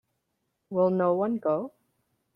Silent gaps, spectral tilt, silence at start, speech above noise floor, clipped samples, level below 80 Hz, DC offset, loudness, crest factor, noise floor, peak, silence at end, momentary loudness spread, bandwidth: none; -11 dB/octave; 0.7 s; 53 dB; under 0.1%; -74 dBFS; under 0.1%; -27 LUFS; 16 dB; -79 dBFS; -12 dBFS; 0.65 s; 9 LU; 5 kHz